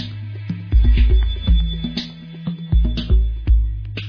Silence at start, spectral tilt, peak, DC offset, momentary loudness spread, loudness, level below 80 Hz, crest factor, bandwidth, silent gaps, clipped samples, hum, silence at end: 0 s; -8 dB/octave; -4 dBFS; under 0.1%; 13 LU; -20 LUFS; -18 dBFS; 12 dB; 5.4 kHz; none; under 0.1%; none; 0 s